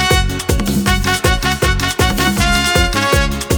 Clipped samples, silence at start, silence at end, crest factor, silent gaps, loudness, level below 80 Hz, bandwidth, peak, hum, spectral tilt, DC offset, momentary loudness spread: under 0.1%; 0 s; 0 s; 14 dB; none; -14 LUFS; -20 dBFS; over 20 kHz; 0 dBFS; none; -4 dB/octave; under 0.1%; 3 LU